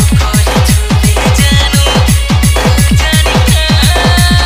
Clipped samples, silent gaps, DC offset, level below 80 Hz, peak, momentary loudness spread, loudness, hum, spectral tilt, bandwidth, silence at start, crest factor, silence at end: 0.3%; none; under 0.1%; -12 dBFS; 0 dBFS; 2 LU; -8 LUFS; none; -4.5 dB/octave; 16.5 kHz; 0 s; 8 dB; 0 s